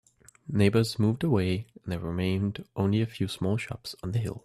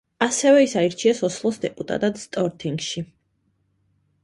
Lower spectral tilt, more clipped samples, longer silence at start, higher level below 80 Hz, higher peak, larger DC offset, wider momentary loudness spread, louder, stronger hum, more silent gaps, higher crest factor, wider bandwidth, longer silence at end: first, -7 dB/octave vs -4.5 dB/octave; neither; first, 0.45 s vs 0.2 s; first, -56 dBFS vs -62 dBFS; second, -10 dBFS vs -4 dBFS; neither; about the same, 11 LU vs 13 LU; second, -29 LUFS vs -22 LUFS; neither; neither; about the same, 18 dB vs 20 dB; first, 13.5 kHz vs 11.5 kHz; second, 0.05 s vs 1.2 s